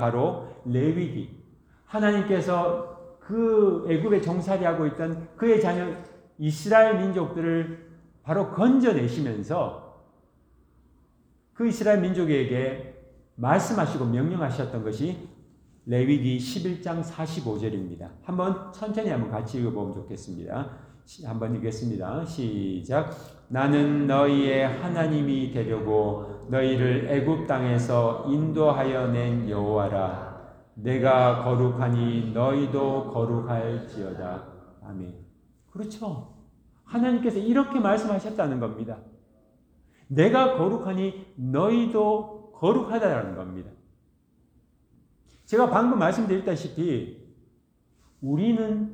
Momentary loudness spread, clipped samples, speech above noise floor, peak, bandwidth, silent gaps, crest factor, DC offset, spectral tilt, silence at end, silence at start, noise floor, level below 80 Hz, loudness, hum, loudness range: 15 LU; under 0.1%; 39 dB; -6 dBFS; 10 kHz; none; 20 dB; under 0.1%; -7.5 dB/octave; 0 s; 0 s; -64 dBFS; -56 dBFS; -25 LUFS; none; 7 LU